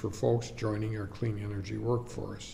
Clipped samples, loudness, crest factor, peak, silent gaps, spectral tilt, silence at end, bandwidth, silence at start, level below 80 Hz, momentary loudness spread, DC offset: under 0.1%; -34 LUFS; 18 dB; -16 dBFS; none; -7 dB/octave; 0 s; 11.5 kHz; 0 s; -52 dBFS; 7 LU; under 0.1%